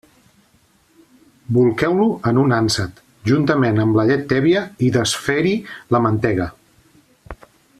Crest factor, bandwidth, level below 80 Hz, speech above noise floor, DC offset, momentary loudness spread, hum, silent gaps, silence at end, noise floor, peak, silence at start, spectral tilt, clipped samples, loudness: 16 dB; 14 kHz; -48 dBFS; 40 dB; under 0.1%; 6 LU; none; none; 0.45 s; -57 dBFS; -2 dBFS; 1.5 s; -6 dB/octave; under 0.1%; -18 LUFS